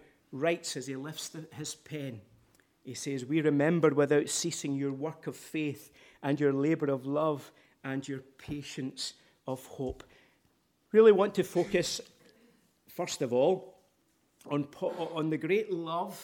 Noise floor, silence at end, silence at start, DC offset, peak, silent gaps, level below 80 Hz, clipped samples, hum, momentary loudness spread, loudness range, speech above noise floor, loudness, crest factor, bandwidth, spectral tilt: -72 dBFS; 0 s; 0.3 s; under 0.1%; -10 dBFS; none; -66 dBFS; under 0.1%; none; 15 LU; 8 LU; 41 dB; -31 LUFS; 22 dB; 17.5 kHz; -5 dB/octave